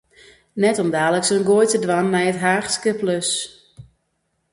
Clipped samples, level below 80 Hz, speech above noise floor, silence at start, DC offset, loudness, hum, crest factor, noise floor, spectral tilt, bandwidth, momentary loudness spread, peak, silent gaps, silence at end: under 0.1%; -62 dBFS; 52 dB; 0.55 s; under 0.1%; -19 LUFS; none; 16 dB; -71 dBFS; -4 dB/octave; 11.5 kHz; 6 LU; -4 dBFS; none; 0.7 s